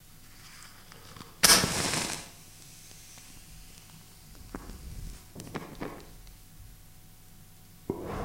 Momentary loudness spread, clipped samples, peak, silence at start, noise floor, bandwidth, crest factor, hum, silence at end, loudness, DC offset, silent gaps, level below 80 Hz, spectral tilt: 28 LU; under 0.1%; 0 dBFS; 0.1 s; -52 dBFS; 16 kHz; 34 dB; none; 0 s; -26 LUFS; under 0.1%; none; -50 dBFS; -1.5 dB/octave